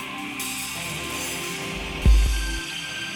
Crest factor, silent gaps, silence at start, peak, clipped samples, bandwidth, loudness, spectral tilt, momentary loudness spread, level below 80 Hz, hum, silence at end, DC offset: 18 dB; none; 0 s; -8 dBFS; under 0.1%; 18 kHz; -26 LUFS; -3.5 dB/octave; 8 LU; -26 dBFS; none; 0 s; under 0.1%